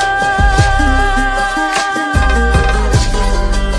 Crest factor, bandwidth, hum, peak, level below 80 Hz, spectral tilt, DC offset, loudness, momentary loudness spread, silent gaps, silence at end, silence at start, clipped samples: 12 dB; 11 kHz; none; 0 dBFS; -14 dBFS; -4.5 dB/octave; under 0.1%; -13 LUFS; 4 LU; none; 0 s; 0 s; under 0.1%